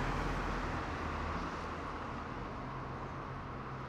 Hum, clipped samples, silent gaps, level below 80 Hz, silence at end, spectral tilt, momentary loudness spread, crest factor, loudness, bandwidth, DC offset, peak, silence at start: none; under 0.1%; none; -46 dBFS; 0 s; -6 dB/octave; 6 LU; 16 dB; -40 LUFS; 12.5 kHz; under 0.1%; -24 dBFS; 0 s